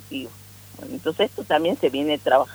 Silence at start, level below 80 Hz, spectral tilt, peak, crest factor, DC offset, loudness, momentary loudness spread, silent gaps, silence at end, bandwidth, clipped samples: 0 s; -62 dBFS; -5 dB/octave; -4 dBFS; 20 dB; under 0.1%; -23 LUFS; 20 LU; none; 0 s; over 20 kHz; under 0.1%